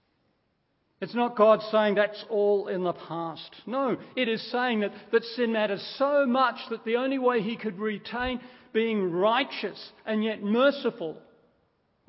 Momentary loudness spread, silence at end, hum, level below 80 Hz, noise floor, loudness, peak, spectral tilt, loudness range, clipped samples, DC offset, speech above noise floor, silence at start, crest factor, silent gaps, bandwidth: 12 LU; 0.9 s; none; -62 dBFS; -73 dBFS; -27 LUFS; -8 dBFS; -9.5 dB/octave; 3 LU; under 0.1%; under 0.1%; 46 dB; 1 s; 20 dB; none; 5.8 kHz